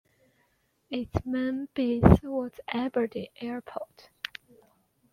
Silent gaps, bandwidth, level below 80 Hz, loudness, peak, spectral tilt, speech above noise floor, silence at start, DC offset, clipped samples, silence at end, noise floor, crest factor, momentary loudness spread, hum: none; 14.5 kHz; -42 dBFS; -28 LUFS; -4 dBFS; -8.5 dB/octave; 44 dB; 0.9 s; under 0.1%; under 0.1%; 1.3 s; -71 dBFS; 26 dB; 19 LU; none